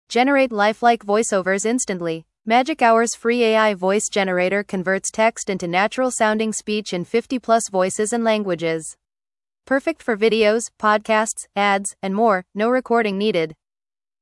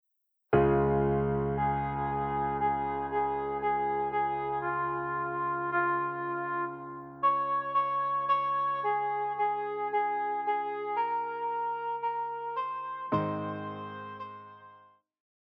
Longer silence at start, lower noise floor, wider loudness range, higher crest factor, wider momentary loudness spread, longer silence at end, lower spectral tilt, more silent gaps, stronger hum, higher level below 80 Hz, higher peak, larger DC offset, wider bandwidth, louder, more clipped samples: second, 0.1 s vs 0.5 s; first, under -90 dBFS vs -59 dBFS; about the same, 3 LU vs 5 LU; about the same, 18 dB vs 20 dB; about the same, 7 LU vs 9 LU; about the same, 0.7 s vs 0.75 s; second, -3.5 dB/octave vs -10 dB/octave; neither; neither; second, -62 dBFS vs -52 dBFS; first, -2 dBFS vs -12 dBFS; neither; first, 12 kHz vs 5.6 kHz; first, -19 LUFS vs -31 LUFS; neither